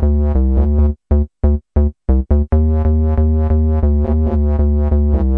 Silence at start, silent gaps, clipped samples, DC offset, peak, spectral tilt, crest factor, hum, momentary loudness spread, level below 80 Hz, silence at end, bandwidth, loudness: 0 s; none; under 0.1%; under 0.1%; -2 dBFS; -13 dB/octave; 12 dB; none; 3 LU; -16 dBFS; 0 s; 2.2 kHz; -16 LUFS